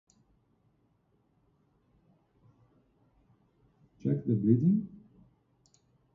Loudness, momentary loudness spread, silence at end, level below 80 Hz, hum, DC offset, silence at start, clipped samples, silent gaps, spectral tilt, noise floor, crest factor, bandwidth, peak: -29 LUFS; 12 LU; 1.15 s; -70 dBFS; none; under 0.1%; 4.05 s; under 0.1%; none; -12 dB/octave; -72 dBFS; 22 dB; 7.4 kHz; -12 dBFS